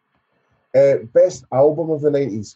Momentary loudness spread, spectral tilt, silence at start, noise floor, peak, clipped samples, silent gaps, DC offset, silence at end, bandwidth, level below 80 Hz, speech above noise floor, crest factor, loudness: 5 LU; -7 dB/octave; 0.75 s; -66 dBFS; -4 dBFS; under 0.1%; none; under 0.1%; 0.05 s; 8 kHz; -62 dBFS; 50 dB; 14 dB; -17 LUFS